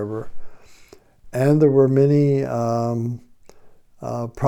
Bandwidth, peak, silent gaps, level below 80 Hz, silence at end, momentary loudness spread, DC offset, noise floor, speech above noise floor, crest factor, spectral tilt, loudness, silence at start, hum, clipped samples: 13.5 kHz; -6 dBFS; none; -48 dBFS; 0 s; 16 LU; under 0.1%; -48 dBFS; 30 dB; 16 dB; -9 dB/octave; -19 LUFS; 0 s; none; under 0.1%